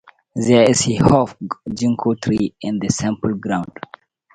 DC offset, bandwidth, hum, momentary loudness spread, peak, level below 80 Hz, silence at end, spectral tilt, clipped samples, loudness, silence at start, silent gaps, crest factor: under 0.1%; 10.5 kHz; none; 16 LU; 0 dBFS; -44 dBFS; 0.7 s; -5.5 dB/octave; under 0.1%; -18 LUFS; 0.35 s; none; 18 dB